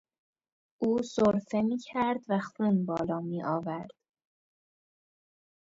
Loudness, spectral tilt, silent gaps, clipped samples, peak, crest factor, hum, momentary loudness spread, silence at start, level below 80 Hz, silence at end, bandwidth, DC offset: -30 LUFS; -7 dB/octave; none; under 0.1%; -14 dBFS; 18 dB; none; 7 LU; 0.8 s; -66 dBFS; 1.75 s; 7.8 kHz; under 0.1%